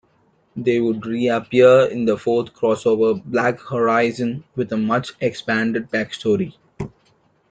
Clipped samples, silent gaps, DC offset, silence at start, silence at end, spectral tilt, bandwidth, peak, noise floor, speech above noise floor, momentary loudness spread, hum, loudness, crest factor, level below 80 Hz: under 0.1%; none; under 0.1%; 0.55 s; 0.6 s; -6.5 dB/octave; 9.2 kHz; -2 dBFS; -60 dBFS; 42 dB; 11 LU; none; -19 LUFS; 18 dB; -58 dBFS